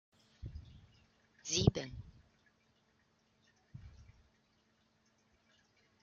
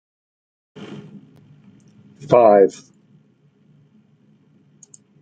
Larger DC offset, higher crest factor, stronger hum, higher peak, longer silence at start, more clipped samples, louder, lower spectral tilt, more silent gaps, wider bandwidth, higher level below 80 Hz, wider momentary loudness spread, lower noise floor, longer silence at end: neither; first, 32 dB vs 20 dB; neither; second, -12 dBFS vs -2 dBFS; second, 0.4 s vs 0.8 s; neither; second, -36 LUFS vs -14 LUFS; second, -5.5 dB/octave vs -7 dB/octave; neither; second, 7.4 kHz vs 9 kHz; first, -58 dBFS vs -66 dBFS; about the same, 27 LU vs 27 LU; first, -75 dBFS vs -57 dBFS; second, 2 s vs 2.5 s